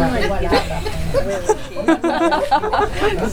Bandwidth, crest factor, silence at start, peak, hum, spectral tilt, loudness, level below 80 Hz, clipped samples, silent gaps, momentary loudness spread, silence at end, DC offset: 19 kHz; 16 dB; 0 s; -2 dBFS; none; -5 dB/octave; -19 LUFS; -28 dBFS; under 0.1%; none; 5 LU; 0 s; under 0.1%